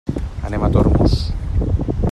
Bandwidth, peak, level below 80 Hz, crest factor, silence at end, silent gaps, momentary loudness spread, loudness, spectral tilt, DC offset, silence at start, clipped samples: 10 kHz; -2 dBFS; -22 dBFS; 16 dB; 0 s; none; 10 LU; -19 LUFS; -8.5 dB/octave; under 0.1%; 0.05 s; under 0.1%